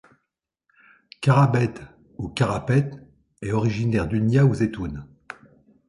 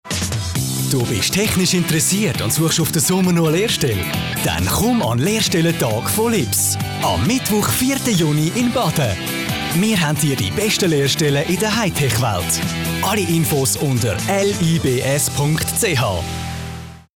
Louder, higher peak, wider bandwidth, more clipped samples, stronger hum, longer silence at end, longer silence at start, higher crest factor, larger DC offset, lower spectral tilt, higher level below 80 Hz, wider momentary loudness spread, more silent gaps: second, -22 LUFS vs -17 LUFS; first, -4 dBFS vs -8 dBFS; second, 11.5 kHz vs 20 kHz; neither; neither; first, 0.85 s vs 0.15 s; first, 1.2 s vs 0.05 s; first, 20 dB vs 10 dB; neither; first, -7.5 dB/octave vs -4 dB/octave; second, -46 dBFS vs -40 dBFS; first, 23 LU vs 5 LU; neither